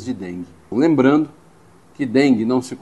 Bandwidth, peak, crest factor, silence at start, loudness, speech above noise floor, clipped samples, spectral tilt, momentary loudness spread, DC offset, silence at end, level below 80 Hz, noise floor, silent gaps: 11.5 kHz; -2 dBFS; 16 dB; 0 s; -18 LUFS; 32 dB; under 0.1%; -6.5 dB/octave; 14 LU; 0.2%; 0.05 s; -60 dBFS; -50 dBFS; none